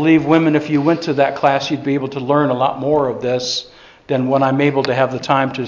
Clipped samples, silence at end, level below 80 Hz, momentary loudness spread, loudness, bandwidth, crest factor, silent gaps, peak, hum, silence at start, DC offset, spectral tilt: under 0.1%; 0 s; -54 dBFS; 6 LU; -16 LUFS; 7.4 kHz; 16 dB; none; 0 dBFS; none; 0 s; under 0.1%; -6 dB/octave